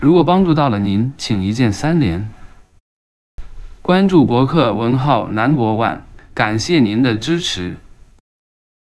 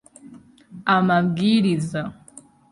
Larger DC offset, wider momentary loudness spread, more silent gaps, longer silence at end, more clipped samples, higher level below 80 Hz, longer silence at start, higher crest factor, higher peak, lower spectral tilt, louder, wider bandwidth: neither; about the same, 12 LU vs 12 LU; first, 2.80-3.38 s vs none; first, 0.95 s vs 0.3 s; neither; first, -40 dBFS vs -60 dBFS; second, 0 s vs 0.25 s; about the same, 16 dB vs 18 dB; first, 0 dBFS vs -4 dBFS; about the same, -6.5 dB/octave vs -6.5 dB/octave; first, -15 LUFS vs -20 LUFS; about the same, 12 kHz vs 11.5 kHz